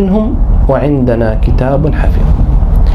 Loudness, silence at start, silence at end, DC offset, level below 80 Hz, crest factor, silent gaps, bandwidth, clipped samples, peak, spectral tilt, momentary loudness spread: -12 LUFS; 0 s; 0 s; under 0.1%; -10 dBFS; 8 dB; none; 5 kHz; under 0.1%; 0 dBFS; -10 dB/octave; 2 LU